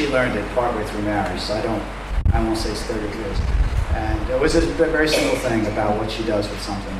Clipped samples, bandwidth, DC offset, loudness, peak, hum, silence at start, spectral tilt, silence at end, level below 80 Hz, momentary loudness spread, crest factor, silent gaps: under 0.1%; 14.5 kHz; under 0.1%; -22 LUFS; -4 dBFS; none; 0 s; -5.5 dB/octave; 0 s; -26 dBFS; 7 LU; 16 dB; none